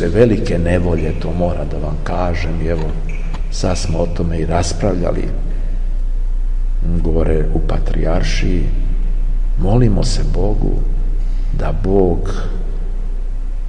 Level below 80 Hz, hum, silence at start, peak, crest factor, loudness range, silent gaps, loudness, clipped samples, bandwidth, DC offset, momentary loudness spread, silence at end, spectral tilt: -16 dBFS; none; 0 s; 0 dBFS; 14 dB; 3 LU; none; -19 LUFS; under 0.1%; 9.4 kHz; 3%; 10 LU; 0 s; -6.5 dB/octave